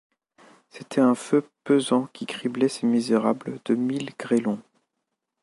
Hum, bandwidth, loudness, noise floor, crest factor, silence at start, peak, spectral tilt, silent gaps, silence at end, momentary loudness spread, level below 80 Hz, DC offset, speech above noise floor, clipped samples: none; 11.5 kHz; -24 LUFS; -81 dBFS; 18 dB; 0.75 s; -8 dBFS; -5.5 dB/octave; none; 0.8 s; 9 LU; -76 dBFS; under 0.1%; 57 dB; under 0.1%